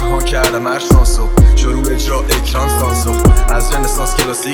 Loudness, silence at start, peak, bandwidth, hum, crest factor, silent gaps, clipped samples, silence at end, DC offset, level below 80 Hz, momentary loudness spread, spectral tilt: -13 LUFS; 0 s; 0 dBFS; 20 kHz; none; 10 dB; none; 0.3%; 0 s; under 0.1%; -12 dBFS; 5 LU; -4.5 dB/octave